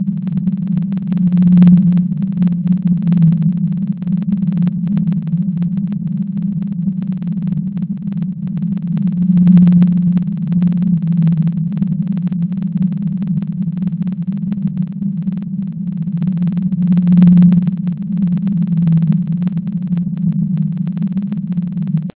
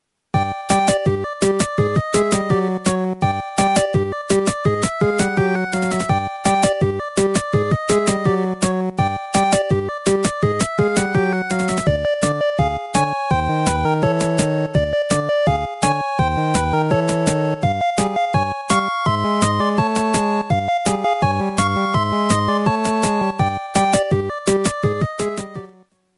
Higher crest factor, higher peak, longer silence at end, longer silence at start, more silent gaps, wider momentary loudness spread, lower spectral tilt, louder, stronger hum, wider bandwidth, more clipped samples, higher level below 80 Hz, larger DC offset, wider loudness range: about the same, 14 dB vs 16 dB; about the same, 0 dBFS vs -2 dBFS; second, 0.1 s vs 0.5 s; second, 0 s vs 0.35 s; neither; first, 11 LU vs 3 LU; first, -13.5 dB/octave vs -5 dB/octave; first, -15 LUFS vs -19 LUFS; neither; second, 4 kHz vs 11.5 kHz; neither; second, -46 dBFS vs -38 dBFS; neither; first, 6 LU vs 1 LU